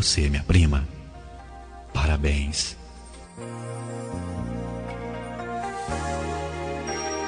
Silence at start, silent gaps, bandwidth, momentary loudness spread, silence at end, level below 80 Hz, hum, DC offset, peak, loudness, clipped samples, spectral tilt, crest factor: 0 s; none; 10 kHz; 22 LU; 0 s; -32 dBFS; none; under 0.1%; -6 dBFS; -27 LUFS; under 0.1%; -4.5 dB/octave; 20 dB